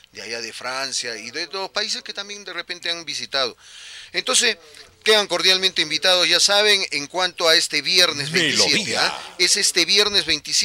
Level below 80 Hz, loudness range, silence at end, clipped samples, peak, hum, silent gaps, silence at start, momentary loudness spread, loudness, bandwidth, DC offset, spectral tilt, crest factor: -60 dBFS; 9 LU; 0 s; under 0.1%; -2 dBFS; none; none; 0.15 s; 14 LU; -18 LUFS; 16 kHz; under 0.1%; -0.5 dB/octave; 20 dB